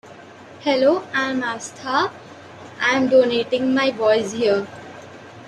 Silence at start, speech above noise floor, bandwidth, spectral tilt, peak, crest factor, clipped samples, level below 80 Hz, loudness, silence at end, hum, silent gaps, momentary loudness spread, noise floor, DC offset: 0.05 s; 23 dB; 10.5 kHz; -4 dB/octave; -4 dBFS; 16 dB; under 0.1%; -66 dBFS; -20 LUFS; 0 s; none; none; 23 LU; -42 dBFS; under 0.1%